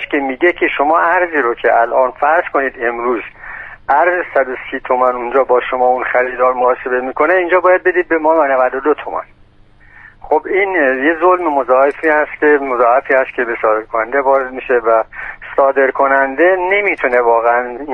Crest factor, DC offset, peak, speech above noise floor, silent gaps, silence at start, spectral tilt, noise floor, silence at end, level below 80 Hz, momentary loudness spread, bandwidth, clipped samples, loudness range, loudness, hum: 14 dB; under 0.1%; 0 dBFS; 32 dB; none; 0 s; -6.5 dB/octave; -45 dBFS; 0 s; -46 dBFS; 6 LU; 4.2 kHz; under 0.1%; 3 LU; -13 LUFS; none